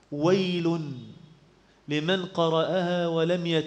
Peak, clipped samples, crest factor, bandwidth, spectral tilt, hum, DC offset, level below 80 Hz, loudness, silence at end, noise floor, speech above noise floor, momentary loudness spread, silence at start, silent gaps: -10 dBFS; under 0.1%; 16 dB; 8.6 kHz; -6.5 dB/octave; none; under 0.1%; -68 dBFS; -26 LUFS; 0 s; -59 dBFS; 33 dB; 8 LU; 0.1 s; none